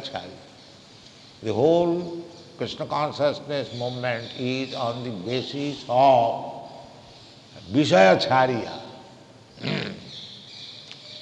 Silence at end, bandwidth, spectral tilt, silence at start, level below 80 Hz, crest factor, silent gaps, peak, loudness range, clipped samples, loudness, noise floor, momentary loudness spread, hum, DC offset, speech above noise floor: 0 s; 9.4 kHz; -5.5 dB/octave; 0 s; -64 dBFS; 20 dB; none; -4 dBFS; 6 LU; under 0.1%; -23 LUFS; -48 dBFS; 22 LU; none; under 0.1%; 25 dB